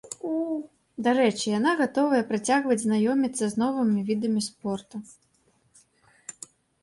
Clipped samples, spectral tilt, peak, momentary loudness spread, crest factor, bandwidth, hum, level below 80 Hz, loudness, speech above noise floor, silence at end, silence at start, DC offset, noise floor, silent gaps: under 0.1%; -4.5 dB/octave; -10 dBFS; 18 LU; 18 dB; 11.5 kHz; none; -70 dBFS; -25 LUFS; 42 dB; 0.5 s; 0.05 s; under 0.1%; -66 dBFS; none